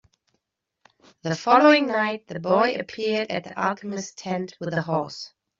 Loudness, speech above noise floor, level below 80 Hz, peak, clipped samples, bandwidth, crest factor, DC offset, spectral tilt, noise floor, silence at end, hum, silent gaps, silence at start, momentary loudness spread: -23 LUFS; 57 dB; -68 dBFS; -2 dBFS; under 0.1%; 7.6 kHz; 22 dB; under 0.1%; -5 dB/octave; -79 dBFS; 0.35 s; none; none; 1.25 s; 15 LU